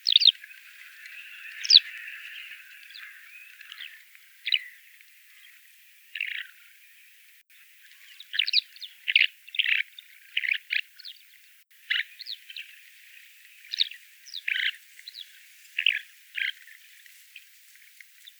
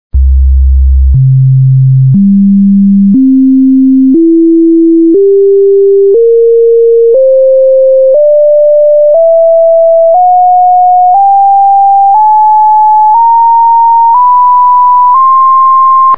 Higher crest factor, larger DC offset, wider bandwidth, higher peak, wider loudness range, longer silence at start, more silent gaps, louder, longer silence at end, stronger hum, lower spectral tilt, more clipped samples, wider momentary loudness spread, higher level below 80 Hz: first, 30 dB vs 4 dB; second, under 0.1% vs 5%; first, over 20 kHz vs 2.2 kHz; about the same, -2 dBFS vs 0 dBFS; first, 10 LU vs 1 LU; about the same, 0.05 s vs 0.1 s; neither; second, -25 LUFS vs -4 LUFS; first, 1.9 s vs 0 s; neither; second, 10.5 dB/octave vs -15 dB/octave; neither; first, 26 LU vs 1 LU; second, under -90 dBFS vs -16 dBFS